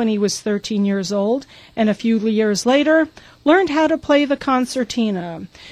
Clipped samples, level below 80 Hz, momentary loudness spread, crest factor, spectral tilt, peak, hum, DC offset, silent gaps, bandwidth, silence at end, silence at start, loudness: under 0.1%; -54 dBFS; 9 LU; 16 dB; -5 dB/octave; -2 dBFS; none; under 0.1%; none; 14.5 kHz; 0 s; 0 s; -18 LUFS